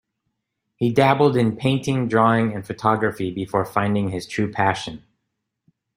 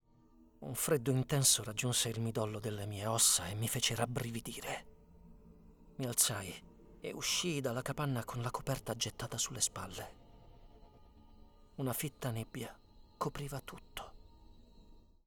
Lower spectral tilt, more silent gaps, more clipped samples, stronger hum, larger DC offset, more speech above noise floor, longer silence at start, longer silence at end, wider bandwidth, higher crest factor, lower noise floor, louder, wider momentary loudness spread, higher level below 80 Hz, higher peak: first, -6.5 dB/octave vs -3 dB/octave; neither; neither; neither; neither; first, 58 dB vs 28 dB; first, 0.8 s vs 0.4 s; first, 1 s vs 0.25 s; second, 16 kHz vs over 20 kHz; about the same, 20 dB vs 24 dB; first, -78 dBFS vs -64 dBFS; first, -21 LUFS vs -35 LUFS; second, 8 LU vs 19 LU; about the same, -56 dBFS vs -60 dBFS; first, -2 dBFS vs -14 dBFS